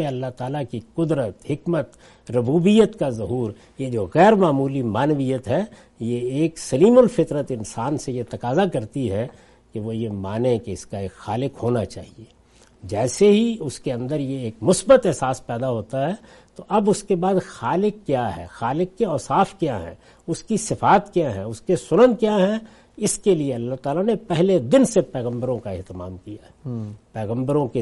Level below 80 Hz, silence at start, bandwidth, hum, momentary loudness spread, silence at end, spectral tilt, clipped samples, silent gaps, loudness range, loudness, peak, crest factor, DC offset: -52 dBFS; 0 s; 11.5 kHz; none; 16 LU; 0 s; -6 dB/octave; under 0.1%; none; 6 LU; -21 LUFS; -2 dBFS; 18 dB; under 0.1%